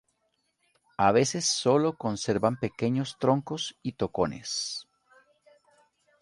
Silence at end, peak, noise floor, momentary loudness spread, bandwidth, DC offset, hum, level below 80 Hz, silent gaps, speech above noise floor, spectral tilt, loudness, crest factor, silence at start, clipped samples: 1.4 s; -8 dBFS; -75 dBFS; 10 LU; 11.5 kHz; under 0.1%; none; -60 dBFS; none; 48 dB; -4.5 dB/octave; -27 LUFS; 22 dB; 1 s; under 0.1%